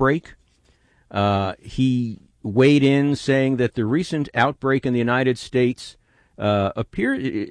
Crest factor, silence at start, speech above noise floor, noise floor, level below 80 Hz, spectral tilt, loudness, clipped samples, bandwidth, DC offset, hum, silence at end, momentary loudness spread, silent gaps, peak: 16 dB; 0 s; 40 dB; -60 dBFS; -50 dBFS; -7 dB/octave; -21 LUFS; under 0.1%; 10.5 kHz; under 0.1%; none; 0 s; 10 LU; none; -4 dBFS